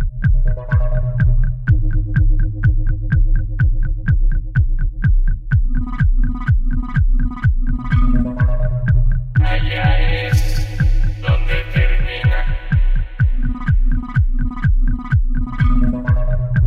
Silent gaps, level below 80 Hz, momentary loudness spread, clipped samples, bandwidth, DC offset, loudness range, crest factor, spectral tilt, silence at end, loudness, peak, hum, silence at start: none; -16 dBFS; 3 LU; under 0.1%; 6.4 kHz; under 0.1%; 1 LU; 12 dB; -7.5 dB/octave; 0 s; -19 LUFS; -2 dBFS; none; 0 s